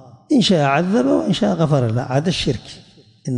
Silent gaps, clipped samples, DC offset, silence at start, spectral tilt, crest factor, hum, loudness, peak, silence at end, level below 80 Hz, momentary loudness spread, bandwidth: none; under 0.1%; under 0.1%; 0.3 s; -6 dB/octave; 14 dB; none; -17 LUFS; -4 dBFS; 0 s; -46 dBFS; 7 LU; 11 kHz